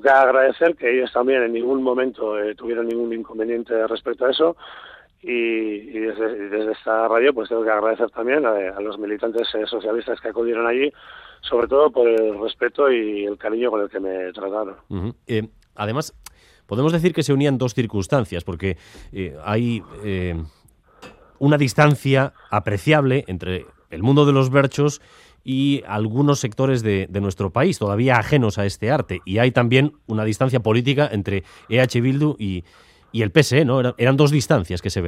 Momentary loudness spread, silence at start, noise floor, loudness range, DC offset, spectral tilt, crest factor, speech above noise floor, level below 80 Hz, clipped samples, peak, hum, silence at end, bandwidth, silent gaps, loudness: 12 LU; 0.05 s; -46 dBFS; 5 LU; under 0.1%; -6.5 dB/octave; 20 dB; 27 dB; -52 dBFS; under 0.1%; 0 dBFS; none; 0 s; 14.5 kHz; none; -20 LUFS